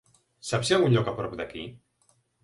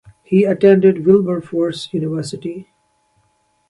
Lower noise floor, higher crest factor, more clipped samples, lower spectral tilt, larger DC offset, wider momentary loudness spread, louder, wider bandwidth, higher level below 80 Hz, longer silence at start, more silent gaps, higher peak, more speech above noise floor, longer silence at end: first, -68 dBFS vs -62 dBFS; about the same, 20 dB vs 16 dB; neither; second, -5.5 dB/octave vs -7.5 dB/octave; neither; about the same, 18 LU vs 16 LU; second, -26 LUFS vs -15 LUFS; about the same, 11.5 kHz vs 11.5 kHz; about the same, -58 dBFS vs -58 dBFS; first, 0.45 s vs 0.3 s; neither; second, -8 dBFS vs 0 dBFS; second, 42 dB vs 47 dB; second, 0.7 s vs 1.05 s